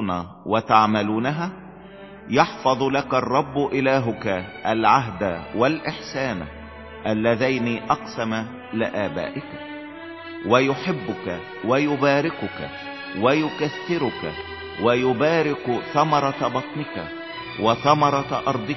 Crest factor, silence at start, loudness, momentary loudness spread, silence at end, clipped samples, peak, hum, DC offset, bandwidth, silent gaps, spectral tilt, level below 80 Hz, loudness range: 22 dB; 0 s; -22 LUFS; 14 LU; 0 s; under 0.1%; 0 dBFS; none; under 0.1%; 6.2 kHz; none; -6 dB/octave; -52 dBFS; 3 LU